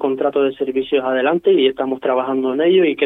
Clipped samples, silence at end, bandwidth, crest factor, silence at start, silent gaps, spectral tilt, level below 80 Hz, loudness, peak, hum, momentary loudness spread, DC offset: under 0.1%; 0 s; 4 kHz; 14 dB; 0 s; none; -7.5 dB/octave; -62 dBFS; -17 LUFS; -2 dBFS; none; 5 LU; under 0.1%